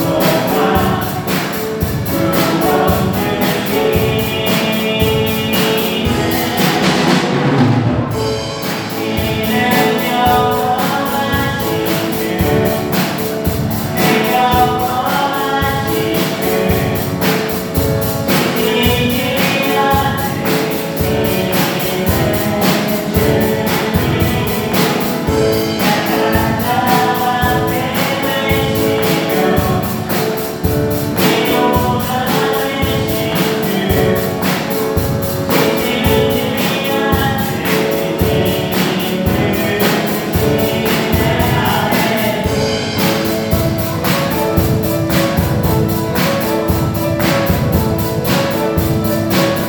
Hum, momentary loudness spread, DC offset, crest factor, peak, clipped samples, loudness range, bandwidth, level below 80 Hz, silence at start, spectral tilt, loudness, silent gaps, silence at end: none; 4 LU; under 0.1%; 14 dB; 0 dBFS; under 0.1%; 1 LU; over 20 kHz; -32 dBFS; 0 s; -5 dB/octave; -14 LUFS; none; 0 s